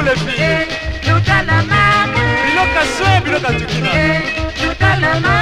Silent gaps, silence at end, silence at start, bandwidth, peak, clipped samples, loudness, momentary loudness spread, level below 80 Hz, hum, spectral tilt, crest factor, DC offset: none; 0 s; 0 s; 12.5 kHz; 0 dBFS; under 0.1%; -13 LUFS; 6 LU; -30 dBFS; none; -5 dB/octave; 14 dB; under 0.1%